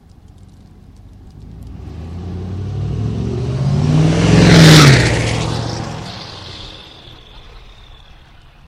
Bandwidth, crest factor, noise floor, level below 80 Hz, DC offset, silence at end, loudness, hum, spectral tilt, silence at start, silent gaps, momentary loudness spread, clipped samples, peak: 15.5 kHz; 16 dB; -42 dBFS; -30 dBFS; under 0.1%; 1.1 s; -12 LUFS; none; -5.5 dB/octave; 1.25 s; none; 25 LU; 0.2%; 0 dBFS